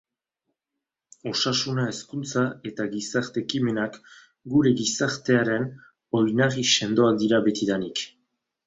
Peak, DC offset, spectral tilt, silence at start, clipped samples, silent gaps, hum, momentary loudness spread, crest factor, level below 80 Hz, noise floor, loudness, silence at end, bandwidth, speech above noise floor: -6 dBFS; under 0.1%; -4.5 dB/octave; 1.25 s; under 0.1%; none; none; 10 LU; 18 dB; -64 dBFS; -85 dBFS; -24 LUFS; 0.6 s; 8 kHz; 61 dB